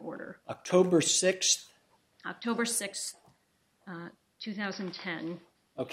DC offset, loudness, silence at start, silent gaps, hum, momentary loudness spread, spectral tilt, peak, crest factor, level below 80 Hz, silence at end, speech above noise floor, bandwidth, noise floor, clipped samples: under 0.1%; -29 LUFS; 0 s; none; none; 20 LU; -3 dB/octave; -12 dBFS; 22 dB; -80 dBFS; 0 s; 41 dB; 16 kHz; -72 dBFS; under 0.1%